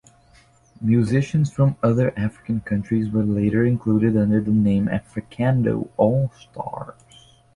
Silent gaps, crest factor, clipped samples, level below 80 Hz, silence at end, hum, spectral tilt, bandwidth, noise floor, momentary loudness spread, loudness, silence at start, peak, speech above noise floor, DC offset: none; 16 dB; under 0.1%; -48 dBFS; 0.65 s; none; -9 dB/octave; 11 kHz; -54 dBFS; 12 LU; -21 LUFS; 0.8 s; -4 dBFS; 34 dB; under 0.1%